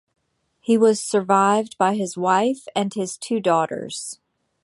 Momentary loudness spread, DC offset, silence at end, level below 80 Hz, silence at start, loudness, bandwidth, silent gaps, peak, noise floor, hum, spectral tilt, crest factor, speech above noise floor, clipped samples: 13 LU; under 0.1%; 0.5 s; -70 dBFS; 0.7 s; -21 LUFS; 11.5 kHz; none; -4 dBFS; -64 dBFS; none; -4.5 dB/octave; 18 dB; 43 dB; under 0.1%